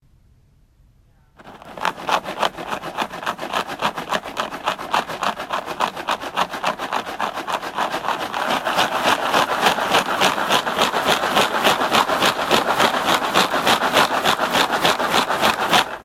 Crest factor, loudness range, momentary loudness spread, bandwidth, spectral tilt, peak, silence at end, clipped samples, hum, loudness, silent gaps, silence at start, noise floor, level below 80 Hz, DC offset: 20 dB; 8 LU; 9 LU; 16.5 kHz; -2 dB/octave; 0 dBFS; 0 s; under 0.1%; none; -19 LUFS; none; 1.4 s; -54 dBFS; -54 dBFS; under 0.1%